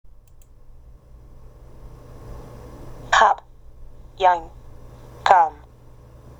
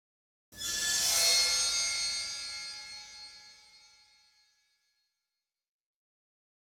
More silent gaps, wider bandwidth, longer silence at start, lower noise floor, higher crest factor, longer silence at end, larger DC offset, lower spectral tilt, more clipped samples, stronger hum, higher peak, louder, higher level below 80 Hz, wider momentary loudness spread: neither; second, 13 kHz vs 19.5 kHz; first, 2.25 s vs 0.5 s; second, -46 dBFS vs -89 dBFS; about the same, 24 dB vs 20 dB; second, 0.9 s vs 3.1 s; neither; first, -3 dB/octave vs 2.5 dB/octave; neither; neither; first, 0 dBFS vs -16 dBFS; first, -19 LUFS vs -28 LUFS; first, -44 dBFS vs -66 dBFS; first, 25 LU vs 21 LU